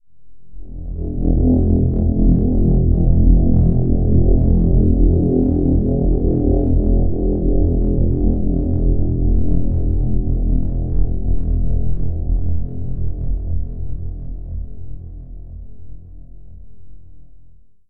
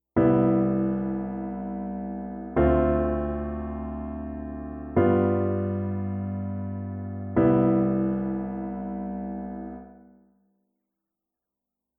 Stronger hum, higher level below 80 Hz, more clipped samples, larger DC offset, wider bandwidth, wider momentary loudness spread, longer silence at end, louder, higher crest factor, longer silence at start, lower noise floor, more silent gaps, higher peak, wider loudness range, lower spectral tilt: neither; first, -20 dBFS vs -40 dBFS; neither; neither; second, 1.1 kHz vs 3.5 kHz; first, 16 LU vs 13 LU; second, 0.35 s vs 2.05 s; first, -18 LUFS vs -27 LUFS; about the same, 14 dB vs 18 dB; about the same, 0.1 s vs 0.15 s; second, -46 dBFS vs -87 dBFS; neither; first, 0 dBFS vs -8 dBFS; first, 14 LU vs 8 LU; first, -15.5 dB/octave vs -12.5 dB/octave